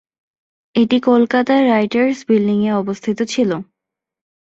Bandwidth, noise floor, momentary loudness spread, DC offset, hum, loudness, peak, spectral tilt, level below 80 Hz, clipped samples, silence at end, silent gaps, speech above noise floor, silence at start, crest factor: 8 kHz; -83 dBFS; 7 LU; under 0.1%; none; -16 LUFS; -2 dBFS; -6 dB/octave; -60 dBFS; under 0.1%; 0.95 s; none; 68 dB; 0.75 s; 16 dB